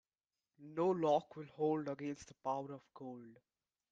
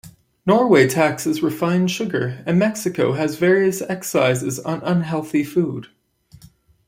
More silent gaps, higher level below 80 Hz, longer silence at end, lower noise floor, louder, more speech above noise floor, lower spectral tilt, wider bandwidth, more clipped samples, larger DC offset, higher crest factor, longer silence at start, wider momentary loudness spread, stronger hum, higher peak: neither; second, -80 dBFS vs -60 dBFS; second, 0.6 s vs 1.05 s; first, under -90 dBFS vs -50 dBFS; second, -39 LUFS vs -19 LUFS; first, over 51 dB vs 31 dB; first, -7 dB/octave vs -5.5 dB/octave; second, 9 kHz vs 16.5 kHz; neither; neither; about the same, 20 dB vs 18 dB; first, 0.6 s vs 0.05 s; first, 17 LU vs 10 LU; neither; second, -22 dBFS vs -2 dBFS